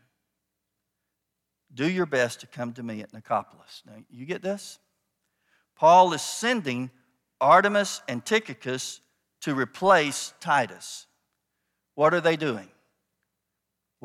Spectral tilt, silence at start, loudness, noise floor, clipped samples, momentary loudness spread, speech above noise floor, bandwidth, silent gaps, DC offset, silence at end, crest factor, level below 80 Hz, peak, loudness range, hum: -4 dB/octave; 1.75 s; -24 LUFS; -83 dBFS; under 0.1%; 19 LU; 58 dB; 15.5 kHz; none; under 0.1%; 1.4 s; 22 dB; -78 dBFS; -6 dBFS; 9 LU; none